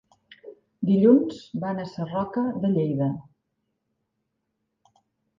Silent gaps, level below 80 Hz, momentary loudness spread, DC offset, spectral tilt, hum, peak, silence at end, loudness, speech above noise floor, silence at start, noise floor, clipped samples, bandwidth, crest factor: none; -66 dBFS; 13 LU; under 0.1%; -9.5 dB/octave; none; -6 dBFS; 2.2 s; -24 LUFS; 55 dB; 0.45 s; -78 dBFS; under 0.1%; 7.4 kHz; 20 dB